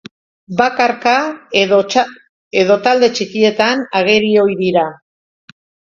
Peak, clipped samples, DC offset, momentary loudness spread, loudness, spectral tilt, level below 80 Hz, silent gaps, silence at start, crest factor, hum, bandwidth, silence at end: 0 dBFS; under 0.1%; under 0.1%; 5 LU; -14 LUFS; -4.5 dB/octave; -58 dBFS; 2.29-2.51 s; 0.5 s; 14 dB; none; 7.6 kHz; 0.95 s